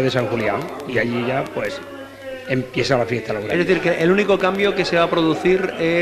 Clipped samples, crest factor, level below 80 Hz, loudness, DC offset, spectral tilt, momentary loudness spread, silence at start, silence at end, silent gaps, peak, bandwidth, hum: under 0.1%; 16 dB; -48 dBFS; -19 LUFS; under 0.1%; -6 dB/octave; 10 LU; 0 s; 0 s; none; -4 dBFS; 13.5 kHz; none